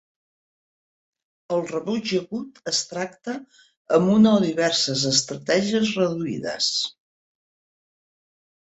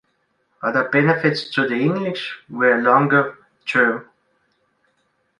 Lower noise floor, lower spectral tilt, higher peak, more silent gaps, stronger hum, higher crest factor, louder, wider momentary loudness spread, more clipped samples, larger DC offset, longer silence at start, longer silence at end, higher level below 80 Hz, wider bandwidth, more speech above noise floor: first, under -90 dBFS vs -67 dBFS; second, -4 dB/octave vs -7 dB/octave; about the same, -4 dBFS vs -2 dBFS; first, 3.77-3.85 s vs none; neither; about the same, 20 dB vs 18 dB; second, -22 LUFS vs -19 LUFS; about the same, 13 LU vs 13 LU; neither; neither; first, 1.5 s vs 0.6 s; first, 1.8 s vs 1.35 s; about the same, -64 dBFS vs -66 dBFS; second, 8.2 kHz vs 11 kHz; first, over 68 dB vs 49 dB